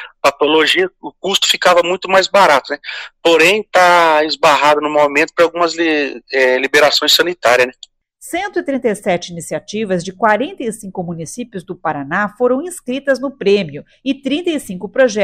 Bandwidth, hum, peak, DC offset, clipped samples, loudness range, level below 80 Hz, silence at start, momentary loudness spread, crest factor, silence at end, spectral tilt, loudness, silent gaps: 16 kHz; none; 0 dBFS; under 0.1%; under 0.1%; 7 LU; -56 dBFS; 0 s; 14 LU; 14 dB; 0 s; -3 dB/octave; -14 LUFS; none